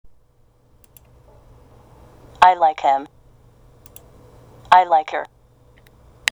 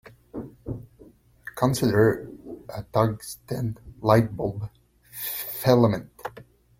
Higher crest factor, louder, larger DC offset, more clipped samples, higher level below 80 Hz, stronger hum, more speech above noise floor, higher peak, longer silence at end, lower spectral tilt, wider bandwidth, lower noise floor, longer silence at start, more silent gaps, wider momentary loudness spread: about the same, 22 dB vs 22 dB; first, -17 LUFS vs -24 LUFS; neither; neither; about the same, -52 dBFS vs -52 dBFS; neither; first, 40 dB vs 31 dB; first, 0 dBFS vs -4 dBFS; first, 1.05 s vs 0.35 s; second, -2 dB/octave vs -6.5 dB/octave; first, over 20 kHz vs 16.5 kHz; about the same, -56 dBFS vs -53 dBFS; first, 2.4 s vs 0.35 s; neither; second, 16 LU vs 19 LU